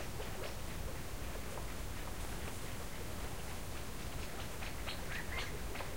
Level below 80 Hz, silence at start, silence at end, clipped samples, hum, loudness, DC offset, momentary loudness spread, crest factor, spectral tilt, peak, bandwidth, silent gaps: -48 dBFS; 0 s; 0 s; under 0.1%; none; -44 LUFS; 0.6%; 3 LU; 16 dB; -4 dB/octave; -28 dBFS; 16 kHz; none